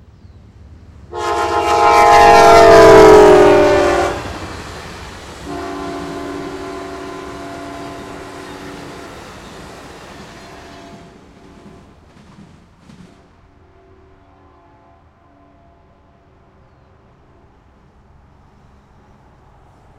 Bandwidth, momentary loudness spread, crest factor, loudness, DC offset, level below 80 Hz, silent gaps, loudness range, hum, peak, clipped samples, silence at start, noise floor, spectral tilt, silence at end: 16 kHz; 29 LU; 16 dB; -8 LUFS; under 0.1%; -38 dBFS; none; 25 LU; none; 0 dBFS; 0.3%; 1.15 s; -49 dBFS; -4.5 dB/octave; 11.05 s